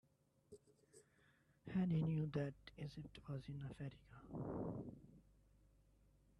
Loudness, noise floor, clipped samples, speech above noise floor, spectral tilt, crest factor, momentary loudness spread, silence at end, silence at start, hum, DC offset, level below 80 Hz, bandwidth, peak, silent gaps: -46 LUFS; -75 dBFS; under 0.1%; 30 dB; -8.5 dB/octave; 18 dB; 23 LU; 1.2 s; 0.5 s; none; under 0.1%; -70 dBFS; 10.5 kHz; -30 dBFS; none